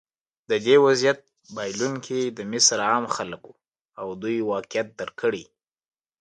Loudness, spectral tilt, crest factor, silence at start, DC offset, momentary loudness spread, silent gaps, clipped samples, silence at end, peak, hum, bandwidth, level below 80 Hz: -23 LUFS; -2.5 dB/octave; 20 dB; 0.5 s; under 0.1%; 17 LU; 3.85-3.89 s; under 0.1%; 0.8 s; -4 dBFS; none; 9.6 kHz; -68 dBFS